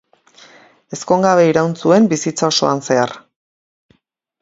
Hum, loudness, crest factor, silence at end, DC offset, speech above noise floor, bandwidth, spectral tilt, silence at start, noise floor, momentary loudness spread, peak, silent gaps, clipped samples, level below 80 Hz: none; -15 LUFS; 16 dB; 1.25 s; under 0.1%; 48 dB; 7.8 kHz; -4.5 dB/octave; 0.9 s; -62 dBFS; 8 LU; 0 dBFS; none; under 0.1%; -60 dBFS